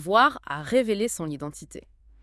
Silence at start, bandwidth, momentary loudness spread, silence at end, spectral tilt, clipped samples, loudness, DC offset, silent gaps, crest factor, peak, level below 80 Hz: 0 s; 12 kHz; 22 LU; 0.4 s; -4 dB/octave; under 0.1%; -25 LUFS; under 0.1%; none; 20 dB; -4 dBFS; -56 dBFS